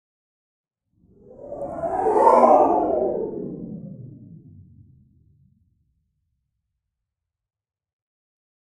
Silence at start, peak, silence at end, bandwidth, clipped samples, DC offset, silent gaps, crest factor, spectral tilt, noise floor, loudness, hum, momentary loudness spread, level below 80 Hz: 1.4 s; -2 dBFS; 4.55 s; 11 kHz; under 0.1%; under 0.1%; none; 24 dB; -8 dB/octave; -84 dBFS; -19 LUFS; none; 24 LU; -58 dBFS